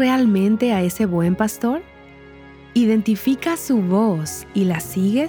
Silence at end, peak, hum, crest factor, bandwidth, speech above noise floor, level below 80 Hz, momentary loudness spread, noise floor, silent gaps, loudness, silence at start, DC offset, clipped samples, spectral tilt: 0 s; -4 dBFS; none; 14 dB; over 20 kHz; 25 dB; -50 dBFS; 7 LU; -43 dBFS; none; -19 LUFS; 0 s; under 0.1%; under 0.1%; -6 dB/octave